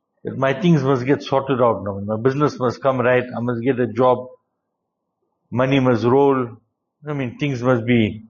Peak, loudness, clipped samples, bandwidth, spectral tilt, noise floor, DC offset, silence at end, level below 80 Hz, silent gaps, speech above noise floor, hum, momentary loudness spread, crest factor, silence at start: -4 dBFS; -19 LUFS; under 0.1%; 7.2 kHz; -6.5 dB/octave; -77 dBFS; under 0.1%; 0.05 s; -56 dBFS; none; 58 dB; none; 9 LU; 16 dB; 0.25 s